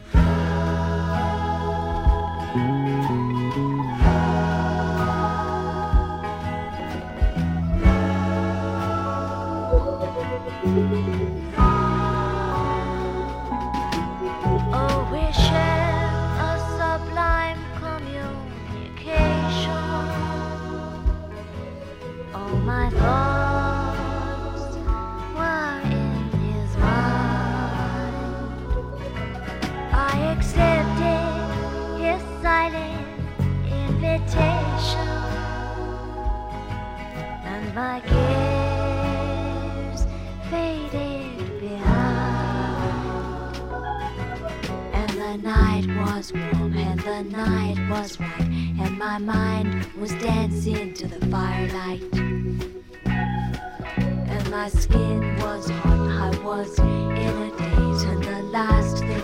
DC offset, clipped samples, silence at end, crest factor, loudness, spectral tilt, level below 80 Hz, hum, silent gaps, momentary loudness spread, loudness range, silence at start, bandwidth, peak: under 0.1%; under 0.1%; 0 s; 20 dB; -24 LUFS; -7 dB/octave; -28 dBFS; none; none; 10 LU; 4 LU; 0 s; 13 kHz; -4 dBFS